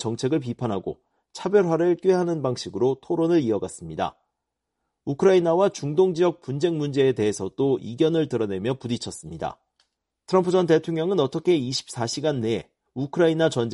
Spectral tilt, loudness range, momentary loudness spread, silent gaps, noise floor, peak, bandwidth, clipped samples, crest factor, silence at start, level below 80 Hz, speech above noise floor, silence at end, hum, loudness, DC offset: -6 dB/octave; 3 LU; 12 LU; none; -82 dBFS; -6 dBFS; 11.5 kHz; under 0.1%; 18 dB; 0 s; -60 dBFS; 59 dB; 0 s; none; -23 LUFS; under 0.1%